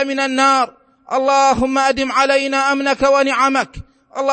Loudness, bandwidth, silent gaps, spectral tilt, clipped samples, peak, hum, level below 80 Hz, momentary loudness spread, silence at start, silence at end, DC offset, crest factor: -15 LUFS; 8.8 kHz; none; -3 dB/octave; under 0.1%; 0 dBFS; none; -44 dBFS; 9 LU; 0 s; 0 s; under 0.1%; 16 dB